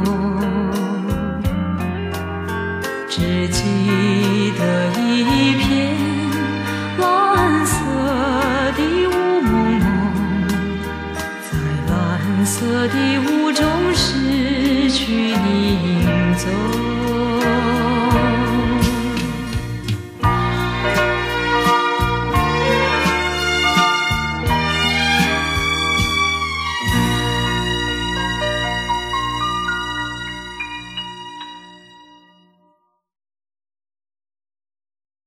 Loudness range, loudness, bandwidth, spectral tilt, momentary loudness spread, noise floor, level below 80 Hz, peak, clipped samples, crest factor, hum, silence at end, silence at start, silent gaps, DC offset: 5 LU; -18 LUFS; 15.5 kHz; -5 dB/octave; 9 LU; -62 dBFS; -32 dBFS; -4 dBFS; under 0.1%; 16 dB; none; 3.5 s; 0 s; none; under 0.1%